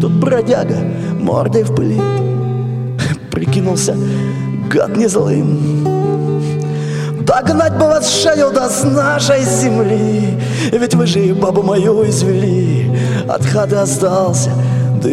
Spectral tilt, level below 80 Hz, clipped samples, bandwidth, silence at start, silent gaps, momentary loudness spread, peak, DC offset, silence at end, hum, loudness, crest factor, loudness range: -5.5 dB/octave; -46 dBFS; under 0.1%; 13.5 kHz; 0 s; none; 6 LU; -2 dBFS; under 0.1%; 0 s; none; -14 LUFS; 12 dB; 3 LU